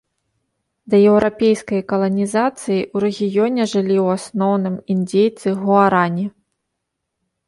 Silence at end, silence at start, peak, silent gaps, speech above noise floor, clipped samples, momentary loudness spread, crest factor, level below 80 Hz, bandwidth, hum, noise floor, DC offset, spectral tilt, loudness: 1.2 s; 0.85 s; -2 dBFS; none; 60 dB; under 0.1%; 7 LU; 16 dB; -56 dBFS; 11.5 kHz; none; -77 dBFS; under 0.1%; -6.5 dB/octave; -17 LUFS